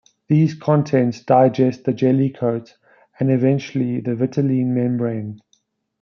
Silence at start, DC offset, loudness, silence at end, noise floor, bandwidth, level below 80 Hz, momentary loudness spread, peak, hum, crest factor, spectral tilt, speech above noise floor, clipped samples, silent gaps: 0.3 s; under 0.1%; -19 LUFS; 0.65 s; -64 dBFS; 6.8 kHz; -66 dBFS; 7 LU; -2 dBFS; none; 16 dB; -9 dB/octave; 47 dB; under 0.1%; none